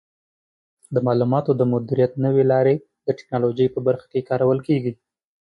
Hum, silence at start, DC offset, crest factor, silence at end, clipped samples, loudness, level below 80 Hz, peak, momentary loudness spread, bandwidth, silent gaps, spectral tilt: none; 0.9 s; under 0.1%; 14 dB; 0.65 s; under 0.1%; -21 LUFS; -62 dBFS; -6 dBFS; 8 LU; 10.5 kHz; none; -10 dB/octave